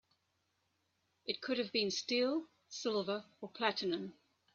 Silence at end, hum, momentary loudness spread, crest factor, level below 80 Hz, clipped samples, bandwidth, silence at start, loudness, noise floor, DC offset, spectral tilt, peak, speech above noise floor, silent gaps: 0.45 s; none; 13 LU; 22 dB; -84 dBFS; under 0.1%; 7.8 kHz; 1.25 s; -37 LUFS; -81 dBFS; under 0.1%; -3.5 dB/octave; -18 dBFS; 44 dB; none